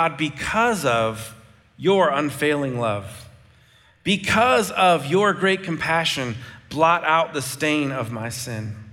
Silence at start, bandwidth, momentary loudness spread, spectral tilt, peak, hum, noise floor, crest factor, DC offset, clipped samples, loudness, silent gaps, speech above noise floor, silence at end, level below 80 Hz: 0 s; 17 kHz; 13 LU; -4.5 dB/octave; -4 dBFS; none; -55 dBFS; 18 dB; under 0.1%; under 0.1%; -21 LUFS; none; 33 dB; 0 s; -54 dBFS